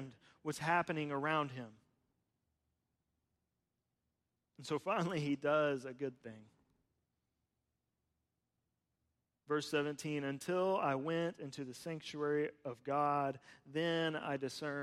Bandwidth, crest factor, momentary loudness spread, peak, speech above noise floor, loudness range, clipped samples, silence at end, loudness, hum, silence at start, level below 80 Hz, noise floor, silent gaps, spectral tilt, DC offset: 15 kHz; 18 dB; 12 LU; -22 dBFS; 49 dB; 8 LU; under 0.1%; 0 s; -38 LUFS; none; 0 s; -82 dBFS; -88 dBFS; none; -5.5 dB/octave; under 0.1%